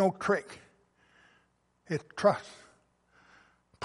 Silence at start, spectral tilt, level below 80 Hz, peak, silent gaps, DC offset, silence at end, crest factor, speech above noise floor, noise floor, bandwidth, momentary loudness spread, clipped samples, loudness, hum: 0 s; -6 dB/octave; -74 dBFS; -10 dBFS; none; under 0.1%; 0 s; 24 dB; 40 dB; -71 dBFS; 11.5 kHz; 23 LU; under 0.1%; -31 LUFS; 60 Hz at -65 dBFS